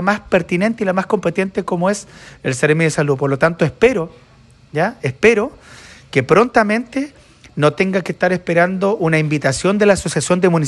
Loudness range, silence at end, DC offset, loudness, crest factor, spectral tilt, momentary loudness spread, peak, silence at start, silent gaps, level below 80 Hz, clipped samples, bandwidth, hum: 1 LU; 0 s; under 0.1%; -16 LUFS; 16 dB; -5.5 dB/octave; 10 LU; 0 dBFS; 0 s; none; -46 dBFS; under 0.1%; 12 kHz; none